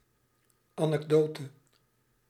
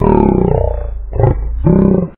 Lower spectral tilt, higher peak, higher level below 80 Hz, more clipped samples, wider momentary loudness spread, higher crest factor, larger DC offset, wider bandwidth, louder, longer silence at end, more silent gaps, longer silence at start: second, -7.5 dB/octave vs -14 dB/octave; second, -12 dBFS vs 0 dBFS; second, -76 dBFS vs -18 dBFS; neither; first, 20 LU vs 9 LU; first, 20 dB vs 12 dB; neither; first, 14 kHz vs 3.6 kHz; second, -29 LUFS vs -13 LUFS; first, 0.8 s vs 0.05 s; neither; first, 0.75 s vs 0 s